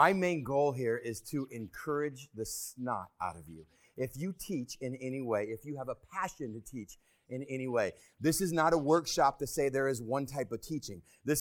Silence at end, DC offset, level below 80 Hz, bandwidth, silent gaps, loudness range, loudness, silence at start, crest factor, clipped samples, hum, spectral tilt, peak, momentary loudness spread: 0 s; under 0.1%; -62 dBFS; 19 kHz; none; 8 LU; -34 LUFS; 0 s; 24 dB; under 0.1%; none; -5 dB/octave; -10 dBFS; 14 LU